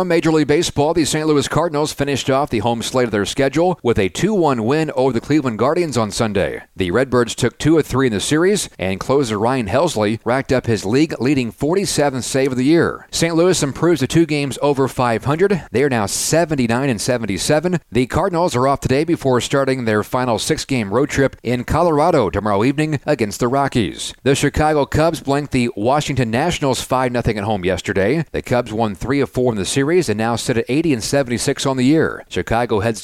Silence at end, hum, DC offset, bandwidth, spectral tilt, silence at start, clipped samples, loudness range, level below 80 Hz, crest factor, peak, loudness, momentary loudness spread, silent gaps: 0 s; none; under 0.1%; 16 kHz; -5 dB/octave; 0 s; under 0.1%; 2 LU; -40 dBFS; 14 dB; -4 dBFS; -17 LUFS; 4 LU; none